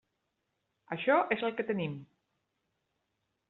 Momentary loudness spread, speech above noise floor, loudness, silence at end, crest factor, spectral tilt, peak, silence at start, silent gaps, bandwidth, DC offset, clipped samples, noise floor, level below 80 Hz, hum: 13 LU; 51 dB; -31 LUFS; 1.45 s; 24 dB; -4 dB/octave; -12 dBFS; 0.9 s; none; 4.3 kHz; under 0.1%; under 0.1%; -82 dBFS; -78 dBFS; none